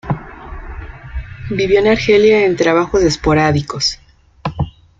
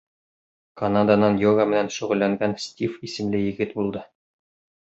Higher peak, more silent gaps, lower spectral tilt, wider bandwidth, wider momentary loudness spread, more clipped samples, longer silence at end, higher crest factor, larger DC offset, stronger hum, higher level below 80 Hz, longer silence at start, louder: first, 0 dBFS vs -4 dBFS; neither; about the same, -5 dB/octave vs -6 dB/octave; about the same, 7.8 kHz vs 8 kHz; first, 21 LU vs 11 LU; neither; second, 0.3 s vs 0.8 s; about the same, 14 dB vs 18 dB; neither; neither; first, -32 dBFS vs -56 dBFS; second, 0.05 s vs 0.75 s; first, -14 LUFS vs -22 LUFS